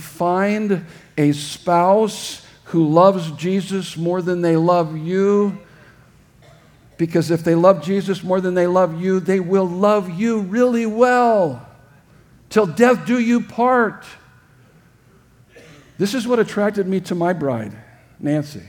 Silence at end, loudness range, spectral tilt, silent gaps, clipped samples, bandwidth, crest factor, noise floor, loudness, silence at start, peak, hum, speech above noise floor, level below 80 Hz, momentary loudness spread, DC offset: 0.05 s; 5 LU; -6.5 dB/octave; none; under 0.1%; 18.5 kHz; 18 dB; -52 dBFS; -18 LUFS; 0 s; 0 dBFS; none; 34 dB; -60 dBFS; 9 LU; under 0.1%